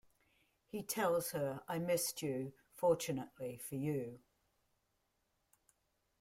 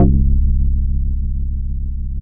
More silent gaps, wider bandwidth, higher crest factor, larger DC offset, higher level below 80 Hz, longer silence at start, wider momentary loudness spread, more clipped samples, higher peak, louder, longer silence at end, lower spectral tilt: neither; first, 16 kHz vs 1.2 kHz; first, 20 dB vs 14 dB; neither; second, -76 dBFS vs -16 dBFS; first, 0.75 s vs 0 s; first, 12 LU vs 9 LU; neither; second, -22 dBFS vs 0 dBFS; second, -39 LUFS vs -20 LUFS; first, 2 s vs 0 s; second, -4.5 dB/octave vs -15.5 dB/octave